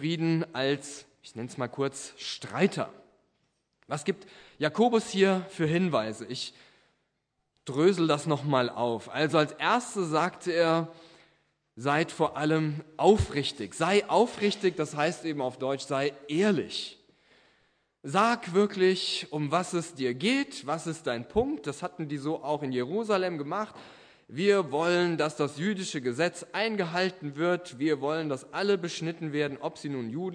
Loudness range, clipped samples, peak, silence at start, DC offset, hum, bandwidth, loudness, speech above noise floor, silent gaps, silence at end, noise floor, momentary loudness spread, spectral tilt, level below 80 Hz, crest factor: 4 LU; under 0.1%; -8 dBFS; 0 s; under 0.1%; none; 10.5 kHz; -29 LUFS; 51 dB; none; 0 s; -79 dBFS; 11 LU; -5 dB/octave; -58 dBFS; 22 dB